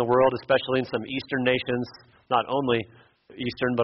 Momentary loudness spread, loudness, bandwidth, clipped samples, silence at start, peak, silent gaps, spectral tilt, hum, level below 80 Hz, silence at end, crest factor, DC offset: 11 LU; -25 LUFS; 5.8 kHz; under 0.1%; 0 s; -8 dBFS; none; -3.5 dB/octave; none; -60 dBFS; 0 s; 18 dB; under 0.1%